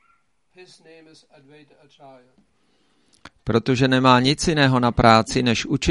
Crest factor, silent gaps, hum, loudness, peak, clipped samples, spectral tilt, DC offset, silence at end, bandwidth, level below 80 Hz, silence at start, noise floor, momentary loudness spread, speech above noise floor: 22 dB; none; none; -18 LUFS; 0 dBFS; under 0.1%; -5 dB/octave; under 0.1%; 0 s; 11.5 kHz; -42 dBFS; 0.6 s; -65 dBFS; 7 LU; 45 dB